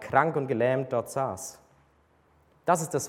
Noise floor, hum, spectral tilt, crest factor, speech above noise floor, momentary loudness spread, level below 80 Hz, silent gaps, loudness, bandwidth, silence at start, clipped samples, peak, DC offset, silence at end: -64 dBFS; none; -5 dB/octave; 22 dB; 37 dB; 11 LU; -66 dBFS; none; -28 LUFS; 17 kHz; 0 s; under 0.1%; -6 dBFS; under 0.1%; 0 s